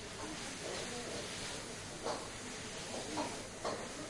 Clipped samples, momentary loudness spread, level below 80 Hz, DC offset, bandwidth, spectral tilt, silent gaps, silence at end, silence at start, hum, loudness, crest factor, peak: under 0.1%; 3 LU; -62 dBFS; under 0.1%; 11.5 kHz; -2.5 dB/octave; none; 0 s; 0 s; none; -42 LUFS; 16 dB; -26 dBFS